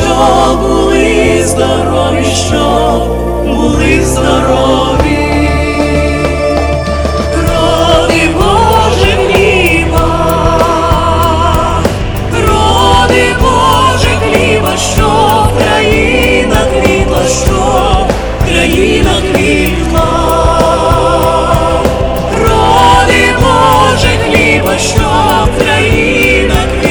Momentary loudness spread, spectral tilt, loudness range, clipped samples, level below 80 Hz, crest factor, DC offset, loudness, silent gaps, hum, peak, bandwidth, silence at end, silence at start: 4 LU; -5 dB/octave; 2 LU; 1%; -16 dBFS; 8 dB; under 0.1%; -8 LUFS; none; none; 0 dBFS; over 20 kHz; 0 s; 0 s